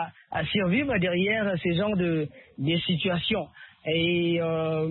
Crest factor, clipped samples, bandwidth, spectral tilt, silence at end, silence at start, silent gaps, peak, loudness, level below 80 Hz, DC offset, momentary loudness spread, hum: 14 dB; under 0.1%; 4.3 kHz; -10.5 dB/octave; 0 s; 0 s; none; -14 dBFS; -26 LUFS; -54 dBFS; under 0.1%; 8 LU; none